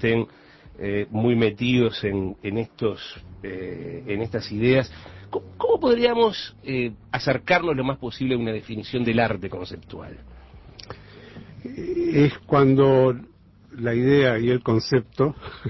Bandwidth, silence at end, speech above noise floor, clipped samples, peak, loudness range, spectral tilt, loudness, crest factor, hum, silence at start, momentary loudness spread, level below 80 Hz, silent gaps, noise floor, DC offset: 6 kHz; 0 s; 22 dB; under 0.1%; -6 dBFS; 7 LU; -7.5 dB/octave; -23 LUFS; 18 dB; none; 0 s; 19 LU; -48 dBFS; none; -44 dBFS; under 0.1%